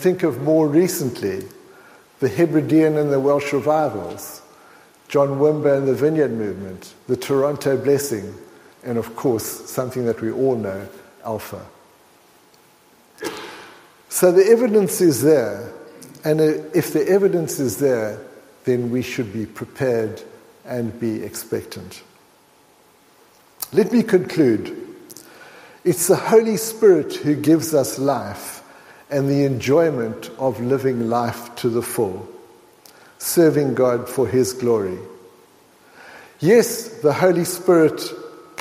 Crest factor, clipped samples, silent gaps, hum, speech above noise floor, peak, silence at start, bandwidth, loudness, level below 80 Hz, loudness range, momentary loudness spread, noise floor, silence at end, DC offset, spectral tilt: 18 dB; under 0.1%; none; none; 35 dB; -2 dBFS; 0 s; 16 kHz; -19 LUFS; -62 dBFS; 8 LU; 19 LU; -54 dBFS; 0.2 s; under 0.1%; -5.5 dB/octave